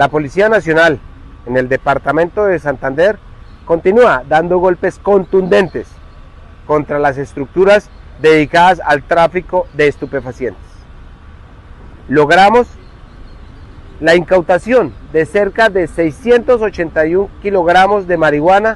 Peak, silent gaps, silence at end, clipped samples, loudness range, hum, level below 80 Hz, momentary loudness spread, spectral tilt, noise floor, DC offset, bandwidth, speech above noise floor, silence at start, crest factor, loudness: 0 dBFS; none; 0 s; under 0.1%; 3 LU; none; -36 dBFS; 9 LU; -6 dB/octave; -36 dBFS; under 0.1%; 11.5 kHz; 24 dB; 0 s; 12 dB; -12 LUFS